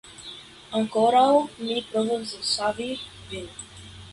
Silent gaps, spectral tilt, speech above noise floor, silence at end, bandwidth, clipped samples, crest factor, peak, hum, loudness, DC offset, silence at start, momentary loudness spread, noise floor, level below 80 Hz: none; -3.5 dB/octave; 20 dB; 0 s; 11.5 kHz; under 0.1%; 18 dB; -8 dBFS; none; -24 LUFS; under 0.1%; 0.05 s; 21 LU; -44 dBFS; -58 dBFS